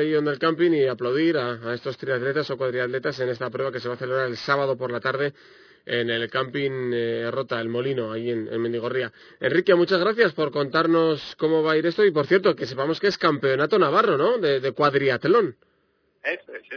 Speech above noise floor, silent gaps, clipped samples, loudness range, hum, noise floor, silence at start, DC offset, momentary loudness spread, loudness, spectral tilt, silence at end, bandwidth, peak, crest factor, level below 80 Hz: 44 dB; none; under 0.1%; 6 LU; none; -67 dBFS; 0 s; under 0.1%; 9 LU; -23 LUFS; -6.5 dB/octave; 0 s; 5.4 kHz; -6 dBFS; 18 dB; -68 dBFS